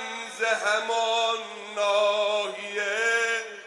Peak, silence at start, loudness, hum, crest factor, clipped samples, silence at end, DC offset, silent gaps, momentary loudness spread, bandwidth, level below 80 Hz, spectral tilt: -10 dBFS; 0 s; -25 LUFS; none; 16 dB; under 0.1%; 0 s; under 0.1%; none; 7 LU; 11.5 kHz; under -90 dBFS; 0 dB/octave